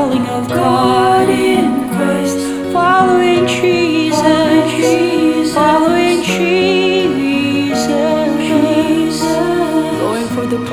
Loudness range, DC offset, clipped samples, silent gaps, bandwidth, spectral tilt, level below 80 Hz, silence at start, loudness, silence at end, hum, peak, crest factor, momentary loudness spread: 2 LU; 0.2%; under 0.1%; none; 18.5 kHz; -5 dB/octave; -48 dBFS; 0 s; -13 LUFS; 0 s; none; 0 dBFS; 12 dB; 6 LU